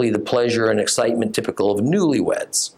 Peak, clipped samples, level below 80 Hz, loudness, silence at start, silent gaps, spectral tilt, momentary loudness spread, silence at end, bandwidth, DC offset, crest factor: -6 dBFS; under 0.1%; -62 dBFS; -19 LUFS; 0 s; none; -4 dB/octave; 3 LU; 0.1 s; 15.5 kHz; under 0.1%; 14 dB